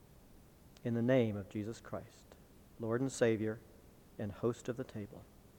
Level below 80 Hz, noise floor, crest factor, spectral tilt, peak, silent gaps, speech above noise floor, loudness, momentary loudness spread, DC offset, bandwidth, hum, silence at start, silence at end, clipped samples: -66 dBFS; -60 dBFS; 22 dB; -6.5 dB/octave; -16 dBFS; none; 24 dB; -38 LUFS; 17 LU; under 0.1%; 19 kHz; none; 0.1 s; 0.35 s; under 0.1%